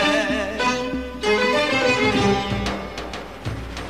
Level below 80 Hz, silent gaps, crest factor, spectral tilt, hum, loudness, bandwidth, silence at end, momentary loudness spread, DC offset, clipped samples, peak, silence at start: -38 dBFS; none; 14 dB; -4.5 dB/octave; none; -21 LUFS; 15 kHz; 0 s; 13 LU; 0.4%; under 0.1%; -8 dBFS; 0 s